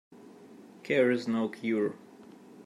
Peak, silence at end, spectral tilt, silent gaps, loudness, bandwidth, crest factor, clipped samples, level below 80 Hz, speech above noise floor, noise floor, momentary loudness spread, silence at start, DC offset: -14 dBFS; 0.05 s; -6.5 dB/octave; none; -29 LUFS; 11.5 kHz; 18 dB; under 0.1%; -82 dBFS; 24 dB; -52 dBFS; 17 LU; 0.1 s; under 0.1%